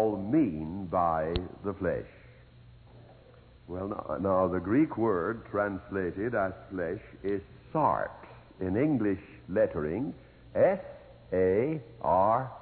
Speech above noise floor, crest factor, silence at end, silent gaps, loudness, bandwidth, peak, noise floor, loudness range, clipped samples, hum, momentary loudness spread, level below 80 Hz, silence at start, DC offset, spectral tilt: 26 dB; 18 dB; 0 s; none; -30 LUFS; 4.5 kHz; -12 dBFS; -55 dBFS; 5 LU; under 0.1%; none; 11 LU; -54 dBFS; 0 s; under 0.1%; -11.5 dB/octave